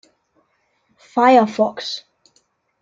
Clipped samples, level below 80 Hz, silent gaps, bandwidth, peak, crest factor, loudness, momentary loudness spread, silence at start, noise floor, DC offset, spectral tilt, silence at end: under 0.1%; -72 dBFS; none; 7.6 kHz; -2 dBFS; 18 dB; -17 LUFS; 15 LU; 1.15 s; -65 dBFS; under 0.1%; -5 dB/octave; 0.85 s